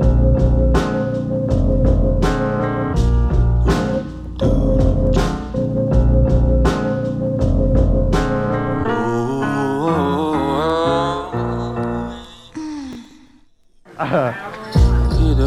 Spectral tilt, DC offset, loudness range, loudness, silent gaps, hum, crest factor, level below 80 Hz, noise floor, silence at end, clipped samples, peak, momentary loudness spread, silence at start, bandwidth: -8 dB/octave; under 0.1%; 6 LU; -18 LUFS; none; none; 14 dB; -20 dBFS; -50 dBFS; 0 s; under 0.1%; -2 dBFS; 9 LU; 0 s; 9.6 kHz